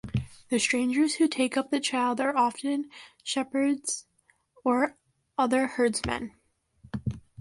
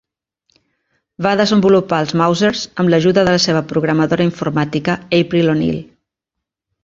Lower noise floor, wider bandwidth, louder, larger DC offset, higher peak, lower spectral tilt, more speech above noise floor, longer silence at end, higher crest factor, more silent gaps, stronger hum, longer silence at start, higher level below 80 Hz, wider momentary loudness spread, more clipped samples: second, -68 dBFS vs -81 dBFS; first, 11.5 kHz vs 7.6 kHz; second, -28 LUFS vs -15 LUFS; neither; second, -12 dBFS vs 0 dBFS; second, -4 dB/octave vs -5.5 dB/octave; second, 41 dB vs 67 dB; second, 0.2 s vs 1 s; about the same, 18 dB vs 16 dB; neither; neither; second, 0.05 s vs 1.2 s; second, -54 dBFS vs -48 dBFS; first, 11 LU vs 6 LU; neither